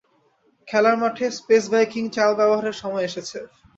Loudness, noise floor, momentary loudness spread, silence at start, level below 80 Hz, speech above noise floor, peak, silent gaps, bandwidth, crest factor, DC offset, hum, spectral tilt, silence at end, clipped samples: -21 LUFS; -63 dBFS; 10 LU; 0.65 s; -66 dBFS; 42 dB; -4 dBFS; none; 8 kHz; 18 dB; under 0.1%; none; -4 dB/octave; 0.3 s; under 0.1%